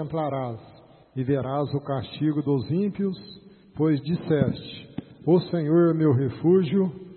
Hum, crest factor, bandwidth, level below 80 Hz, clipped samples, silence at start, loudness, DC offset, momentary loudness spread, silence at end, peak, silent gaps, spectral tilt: none; 18 dB; 4.4 kHz; -60 dBFS; under 0.1%; 0 s; -24 LUFS; under 0.1%; 17 LU; 0 s; -6 dBFS; none; -12.5 dB/octave